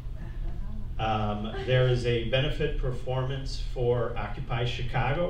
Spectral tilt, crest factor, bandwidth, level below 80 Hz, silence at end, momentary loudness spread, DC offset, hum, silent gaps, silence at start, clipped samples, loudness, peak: -7 dB/octave; 16 dB; 9 kHz; -34 dBFS; 0 s; 14 LU; under 0.1%; none; none; 0 s; under 0.1%; -30 LUFS; -12 dBFS